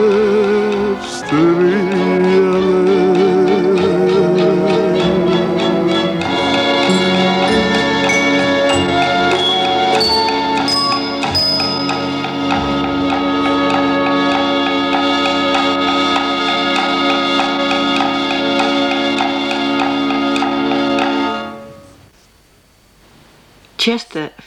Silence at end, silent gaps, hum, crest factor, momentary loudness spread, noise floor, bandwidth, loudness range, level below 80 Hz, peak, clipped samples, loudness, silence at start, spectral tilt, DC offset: 0.15 s; none; none; 12 dB; 4 LU; -50 dBFS; 16 kHz; 4 LU; -46 dBFS; -2 dBFS; under 0.1%; -14 LUFS; 0 s; -5 dB/octave; under 0.1%